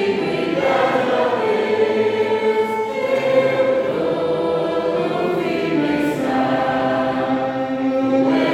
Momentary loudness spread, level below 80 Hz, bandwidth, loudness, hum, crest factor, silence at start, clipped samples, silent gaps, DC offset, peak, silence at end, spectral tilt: 4 LU; -56 dBFS; 13.5 kHz; -19 LUFS; none; 14 dB; 0 s; under 0.1%; none; under 0.1%; -4 dBFS; 0 s; -6.5 dB/octave